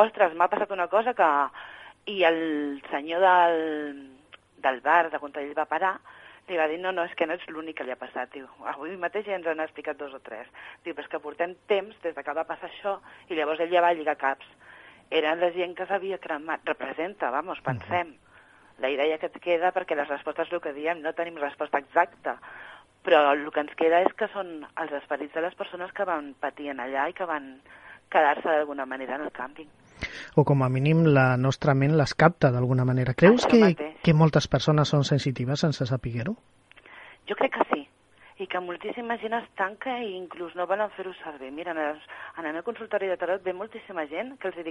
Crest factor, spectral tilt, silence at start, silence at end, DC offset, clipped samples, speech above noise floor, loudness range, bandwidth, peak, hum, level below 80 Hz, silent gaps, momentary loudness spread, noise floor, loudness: 24 dB; -6.5 dB/octave; 0 s; 0 s; under 0.1%; under 0.1%; 30 dB; 10 LU; 9.6 kHz; -4 dBFS; none; -58 dBFS; none; 16 LU; -56 dBFS; -26 LUFS